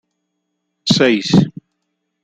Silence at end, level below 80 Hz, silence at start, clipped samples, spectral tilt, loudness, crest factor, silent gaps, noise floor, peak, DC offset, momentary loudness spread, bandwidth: 0.75 s; -50 dBFS; 0.85 s; under 0.1%; -5.5 dB/octave; -15 LUFS; 16 dB; none; -73 dBFS; -2 dBFS; under 0.1%; 11 LU; 9.2 kHz